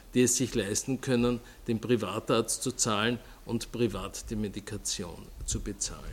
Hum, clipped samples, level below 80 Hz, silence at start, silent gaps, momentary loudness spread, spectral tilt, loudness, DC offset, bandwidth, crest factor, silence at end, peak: none; under 0.1%; -48 dBFS; 0 s; none; 10 LU; -4 dB/octave; -30 LUFS; under 0.1%; 17 kHz; 20 dB; 0 s; -12 dBFS